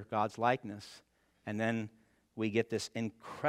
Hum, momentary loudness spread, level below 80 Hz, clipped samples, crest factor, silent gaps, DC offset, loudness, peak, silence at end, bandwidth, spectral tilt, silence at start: none; 16 LU; -78 dBFS; under 0.1%; 22 dB; none; under 0.1%; -36 LUFS; -14 dBFS; 0 s; 14.5 kHz; -5.5 dB/octave; 0 s